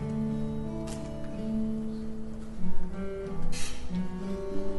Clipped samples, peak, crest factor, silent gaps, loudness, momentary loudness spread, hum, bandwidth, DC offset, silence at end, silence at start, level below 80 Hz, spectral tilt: under 0.1%; -12 dBFS; 14 dB; none; -36 LUFS; 7 LU; none; 11.5 kHz; under 0.1%; 0 s; 0 s; -38 dBFS; -6.5 dB/octave